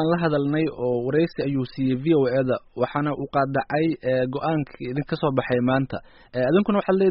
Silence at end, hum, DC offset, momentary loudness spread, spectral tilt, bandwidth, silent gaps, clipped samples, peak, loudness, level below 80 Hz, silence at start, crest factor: 0 s; none; under 0.1%; 6 LU; -6.5 dB/octave; 5.6 kHz; none; under 0.1%; -8 dBFS; -23 LUFS; -54 dBFS; 0 s; 16 dB